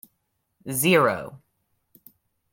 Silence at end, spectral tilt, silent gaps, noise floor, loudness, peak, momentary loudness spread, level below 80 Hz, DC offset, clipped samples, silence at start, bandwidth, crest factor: 1.15 s; -4 dB/octave; none; -75 dBFS; -22 LUFS; -6 dBFS; 23 LU; -66 dBFS; under 0.1%; under 0.1%; 0.65 s; 17 kHz; 22 dB